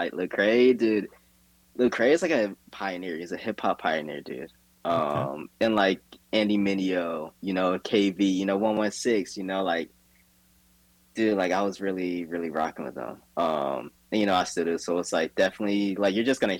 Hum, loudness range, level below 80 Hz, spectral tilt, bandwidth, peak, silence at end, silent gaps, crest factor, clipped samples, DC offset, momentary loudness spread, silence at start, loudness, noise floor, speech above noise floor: none; 4 LU; -66 dBFS; -5 dB/octave; 18 kHz; -10 dBFS; 0 s; none; 18 dB; under 0.1%; under 0.1%; 12 LU; 0 s; -26 LUFS; -62 dBFS; 36 dB